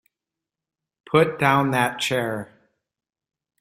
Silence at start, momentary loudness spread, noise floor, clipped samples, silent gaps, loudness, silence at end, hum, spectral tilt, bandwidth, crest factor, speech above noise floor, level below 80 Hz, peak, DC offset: 1.1 s; 12 LU; -88 dBFS; under 0.1%; none; -21 LUFS; 1.15 s; none; -5 dB/octave; 16 kHz; 22 dB; 67 dB; -60 dBFS; -2 dBFS; under 0.1%